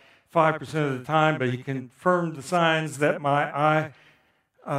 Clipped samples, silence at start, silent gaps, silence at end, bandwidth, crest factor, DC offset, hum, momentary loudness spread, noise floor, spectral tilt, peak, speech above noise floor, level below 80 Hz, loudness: under 0.1%; 0.35 s; none; 0 s; 14 kHz; 20 dB; under 0.1%; none; 6 LU; -64 dBFS; -6 dB/octave; -4 dBFS; 40 dB; -72 dBFS; -24 LUFS